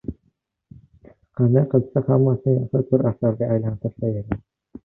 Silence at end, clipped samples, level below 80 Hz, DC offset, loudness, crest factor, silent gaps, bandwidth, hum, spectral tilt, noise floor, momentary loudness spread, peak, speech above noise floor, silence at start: 0.5 s; under 0.1%; -48 dBFS; under 0.1%; -21 LUFS; 18 dB; none; 2.7 kHz; none; -14.5 dB/octave; -68 dBFS; 11 LU; -4 dBFS; 48 dB; 0.05 s